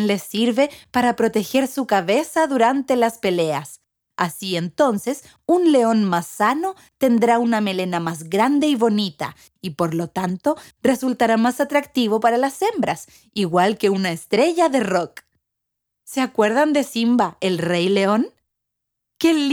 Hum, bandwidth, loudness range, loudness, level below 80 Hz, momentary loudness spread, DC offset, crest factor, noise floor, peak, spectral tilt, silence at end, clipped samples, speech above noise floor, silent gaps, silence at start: none; over 20 kHz; 2 LU; -20 LUFS; -62 dBFS; 8 LU; under 0.1%; 16 dB; -80 dBFS; -4 dBFS; -5 dB/octave; 0 s; under 0.1%; 61 dB; none; 0 s